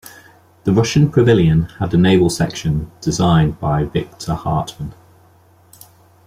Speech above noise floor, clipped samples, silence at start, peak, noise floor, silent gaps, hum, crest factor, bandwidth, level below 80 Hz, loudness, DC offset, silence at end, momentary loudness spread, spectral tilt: 35 dB; under 0.1%; 0.05 s; -2 dBFS; -50 dBFS; none; none; 14 dB; 15 kHz; -38 dBFS; -16 LUFS; under 0.1%; 1.35 s; 11 LU; -6.5 dB/octave